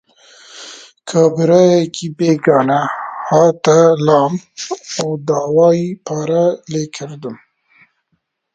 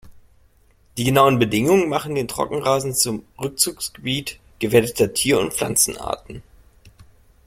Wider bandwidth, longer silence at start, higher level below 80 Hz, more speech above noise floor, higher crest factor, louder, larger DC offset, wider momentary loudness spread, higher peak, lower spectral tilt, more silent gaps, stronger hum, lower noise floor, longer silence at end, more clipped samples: second, 9 kHz vs 16.5 kHz; first, 0.55 s vs 0.05 s; second, -60 dBFS vs -48 dBFS; first, 54 dB vs 36 dB; second, 14 dB vs 20 dB; first, -14 LUFS vs -20 LUFS; neither; first, 17 LU vs 13 LU; about the same, 0 dBFS vs -2 dBFS; first, -6 dB/octave vs -4 dB/octave; neither; neither; first, -68 dBFS vs -56 dBFS; first, 1.2 s vs 0.55 s; neither